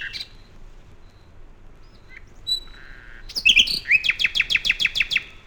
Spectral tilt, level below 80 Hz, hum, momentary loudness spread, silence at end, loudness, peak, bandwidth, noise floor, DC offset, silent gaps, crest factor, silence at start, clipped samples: 0.5 dB/octave; -44 dBFS; none; 17 LU; 0.05 s; -18 LUFS; -4 dBFS; 17.5 kHz; -46 dBFS; 0.1%; none; 20 dB; 0 s; under 0.1%